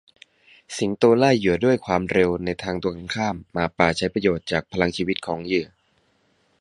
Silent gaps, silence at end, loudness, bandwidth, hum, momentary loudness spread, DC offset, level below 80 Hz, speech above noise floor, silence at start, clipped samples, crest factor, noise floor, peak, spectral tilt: none; 0.95 s; -22 LUFS; 11.5 kHz; none; 9 LU; under 0.1%; -48 dBFS; 43 dB; 0.7 s; under 0.1%; 22 dB; -65 dBFS; 0 dBFS; -5.5 dB/octave